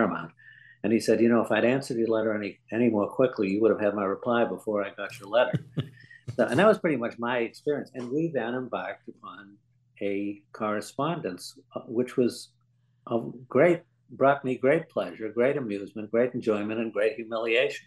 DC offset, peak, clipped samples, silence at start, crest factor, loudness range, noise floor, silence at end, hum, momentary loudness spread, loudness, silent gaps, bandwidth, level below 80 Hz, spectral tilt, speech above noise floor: under 0.1%; -8 dBFS; under 0.1%; 0 s; 20 dB; 7 LU; -67 dBFS; 0.05 s; none; 14 LU; -27 LUFS; none; 12.5 kHz; -74 dBFS; -6.5 dB/octave; 40 dB